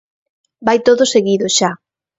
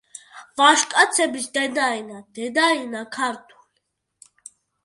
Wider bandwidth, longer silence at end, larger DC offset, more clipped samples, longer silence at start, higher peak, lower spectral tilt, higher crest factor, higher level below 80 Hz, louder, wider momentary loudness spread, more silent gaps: second, 8 kHz vs 11.5 kHz; second, 0.45 s vs 1.45 s; neither; neither; first, 0.6 s vs 0.35 s; about the same, 0 dBFS vs -2 dBFS; first, -3 dB/octave vs -0.5 dB/octave; second, 16 dB vs 22 dB; first, -58 dBFS vs -74 dBFS; first, -14 LUFS vs -20 LUFS; second, 9 LU vs 21 LU; neither